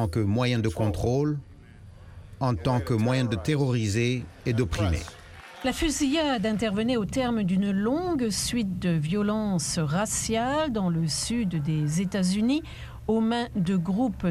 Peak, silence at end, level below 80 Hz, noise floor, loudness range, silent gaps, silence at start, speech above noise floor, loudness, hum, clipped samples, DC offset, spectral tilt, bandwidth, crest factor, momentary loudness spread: -12 dBFS; 0 s; -44 dBFS; -47 dBFS; 1 LU; none; 0 s; 22 dB; -26 LUFS; none; under 0.1%; under 0.1%; -5.5 dB/octave; 15 kHz; 14 dB; 5 LU